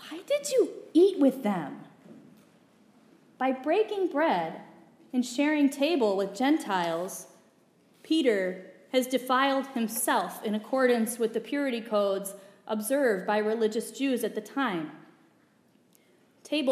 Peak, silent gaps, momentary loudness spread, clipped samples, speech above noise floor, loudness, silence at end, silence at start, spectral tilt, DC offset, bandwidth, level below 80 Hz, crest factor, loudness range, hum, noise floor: -12 dBFS; none; 9 LU; under 0.1%; 37 dB; -28 LUFS; 0 s; 0 s; -4 dB/octave; under 0.1%; 15.5 kHz; -90 dBFS; 18 dB; 4 LU; none; -64 dBFS